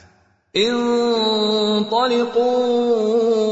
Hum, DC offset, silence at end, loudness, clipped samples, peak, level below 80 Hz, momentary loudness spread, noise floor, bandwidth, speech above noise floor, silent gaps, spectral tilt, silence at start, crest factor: none; under 0.1%; 0 s; -18 LUFS; under 0.1%; -6 dBFS; -62 dBFS; 1 LU; -55 dBFS; 8 kHz; 38 dB; none; -4.5 dB/octave; 0.55 s; 12 dB